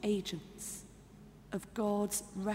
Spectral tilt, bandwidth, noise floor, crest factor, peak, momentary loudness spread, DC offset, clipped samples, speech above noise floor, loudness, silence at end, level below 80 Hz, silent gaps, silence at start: -4.5 dB/octave; 16 kHz; -56 dBFS; 16 dB; -22 dBFS; 22 LU; under 0.1%; under 0.1%; 19 dB; -38 LUFS; 0 s; -62 dBFS; none; 0 s